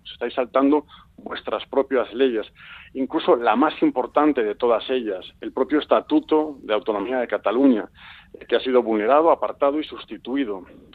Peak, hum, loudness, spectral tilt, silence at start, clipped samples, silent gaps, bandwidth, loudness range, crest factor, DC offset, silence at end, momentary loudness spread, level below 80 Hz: -4 dBFS; none; -21 LUFS; -7.5 dB/octave; 0.05 s; under 0.1%; none; 4.7 kHz; 2 LU; 18 dB; under 0.1%; 0.3 s; 13 LU; -58 dBFS